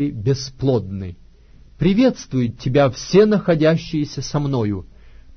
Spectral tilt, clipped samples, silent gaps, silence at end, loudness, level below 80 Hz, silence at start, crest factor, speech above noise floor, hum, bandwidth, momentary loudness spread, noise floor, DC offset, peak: -7 dB/octave; under 0.1%; none; 0 s; -19 LUFS; -42 dBFS; 0 s; 16 dB; 28 dB; none; 6.6 kHz; 9 LU; -46 dBFS; under 0.1%; -2 dBFS